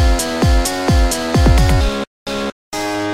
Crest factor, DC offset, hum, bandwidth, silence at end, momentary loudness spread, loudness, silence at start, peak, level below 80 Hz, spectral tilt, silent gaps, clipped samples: 14 dB; 0.7%; none; 15.5 kHz; 0 s; 11 LU; -16 LUFS; 0 s; -2 dBFS; -18 dBFS; -5 dB/octave; 2.07-2.26 s, 2.52-2.72 s; under 0.1%